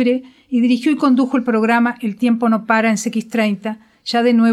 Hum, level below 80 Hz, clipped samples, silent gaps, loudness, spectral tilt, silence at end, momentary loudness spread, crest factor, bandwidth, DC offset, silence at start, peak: none; -66 dBFS; under 0.1%; none; -17 LUFS; -5 dB/octave; 0 s; 7 LU; 14 dB; 12.5 kHz; under 0.1%; 0 s; -2 dBFS